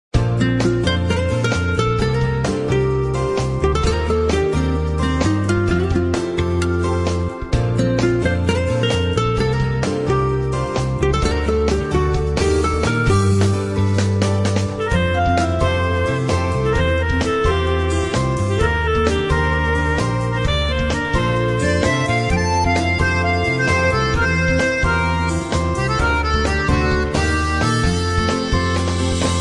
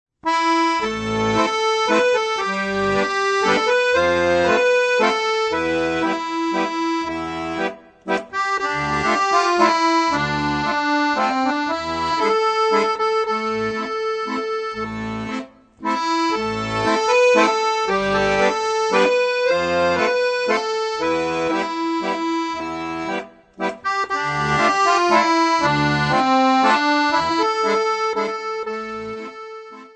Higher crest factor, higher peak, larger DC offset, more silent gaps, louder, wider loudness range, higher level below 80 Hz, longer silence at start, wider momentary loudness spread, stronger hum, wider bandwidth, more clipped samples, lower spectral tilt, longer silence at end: about the same, 16 dB vs 18 dB; about the same, -2 dBFS vs -2 dBFS; first, 0.1% vs under 0.1%; neither; about the same, -18 LUFS vs -19 LUFS; second, 2 LU vs 5 LU; first, -28 dBFS vs -50 dBFS; about the same, 0.15 s vs 0.25 s; second, 3 LU vs 10 LU; neither; first, 11.5 kHz vs 9.4 kHz; neither; first, -6 dB/octave vs -4 dB/octave; about the same, 0 s vs 0.1 s